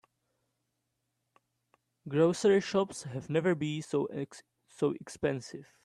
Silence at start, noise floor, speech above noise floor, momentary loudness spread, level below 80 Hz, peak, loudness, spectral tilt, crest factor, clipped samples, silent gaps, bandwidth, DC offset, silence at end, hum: 2.05 s; -82 dBFS; 51 dB; 14 LU; -72 dBFS; -14 dBFS; -31 LUFS; -6 dB/octave; 20 dB; under 0.1%; none; 12 kHz; under 0.1%; 0.2 s; none